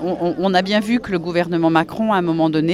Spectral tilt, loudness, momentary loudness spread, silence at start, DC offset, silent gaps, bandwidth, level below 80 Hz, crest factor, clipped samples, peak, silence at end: -6.5 dB/octave; -18 LUFS; 4 LU; 0 s; under 0.1%; none; 13 kHz; -50 dBFS; 16 dB; under 0.1%; -2 dBFS; 0 s